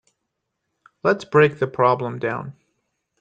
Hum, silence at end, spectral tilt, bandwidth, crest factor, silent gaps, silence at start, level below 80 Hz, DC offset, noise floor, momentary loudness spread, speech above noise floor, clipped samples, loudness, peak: none; 0.7 s; -7 dB/octave; 7.8 kHz; 18 dB; none; 1.05 s; -62 dBFS; under 0.1%; -78 dBFS; 11 LU; 59 dB; under 0.1%; -20 LUFS; -4 dBFS